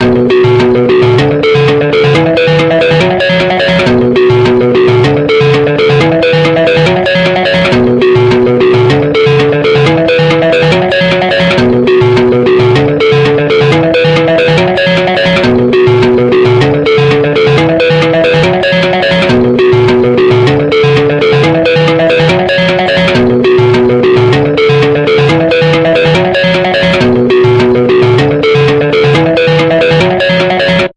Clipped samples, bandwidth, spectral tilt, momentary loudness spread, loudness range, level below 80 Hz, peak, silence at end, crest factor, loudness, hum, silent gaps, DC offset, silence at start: under 0.1%; 9.6 kHz; -7 dB/octave; 1 LU; 0 LU; -36 dBFS; 0 dBFS; 0.05 s; 6 dB; -7 LUFS; none; none; under 0.1%; 0 s